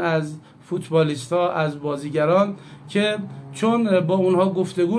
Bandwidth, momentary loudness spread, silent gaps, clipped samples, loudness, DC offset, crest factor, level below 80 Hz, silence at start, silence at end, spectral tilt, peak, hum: 11 kHz; 12 LU; none; under 0.1%; -21 LUFS; under 0.1%; 16 dB; -66 dBFS; 0 s; 0 s; -6.5 dB/octave; -6 dBFS; none